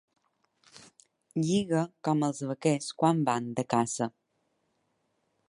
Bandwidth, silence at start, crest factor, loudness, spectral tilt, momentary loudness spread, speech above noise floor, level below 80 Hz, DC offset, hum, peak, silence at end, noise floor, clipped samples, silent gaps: 11.5 kHz; 0.75 s; 20 dB; -29 LUFS; -5.5 dB/octave; 6 LU; 48 dB; -72 dBFS; under 0.1%; none; -10 dBFS; 1.4 s; -76 dBFS; under 0.1%; none